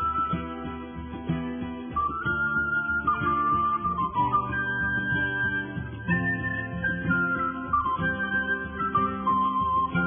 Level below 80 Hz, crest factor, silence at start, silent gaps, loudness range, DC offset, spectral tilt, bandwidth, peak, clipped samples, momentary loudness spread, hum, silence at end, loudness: -46 dBFS; 14 dB; 0 s; none; 2 LU; under 0.1%; -10 dB/octave; 3.6 kHz; -12 dBFS; under 0.1%; 8 LU; none; 0 s; -26 LUFS